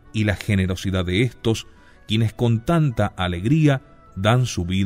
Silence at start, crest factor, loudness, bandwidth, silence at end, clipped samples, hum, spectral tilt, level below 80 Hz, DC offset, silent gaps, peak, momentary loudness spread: 0.15 s; 18 dB; -21 LUFS; 15.5 kHz; 0 s; under 0.1%; none; -6.5 dB/octave; -42 dBFS; under 0.1%; none; -2 dBFS; 6 LU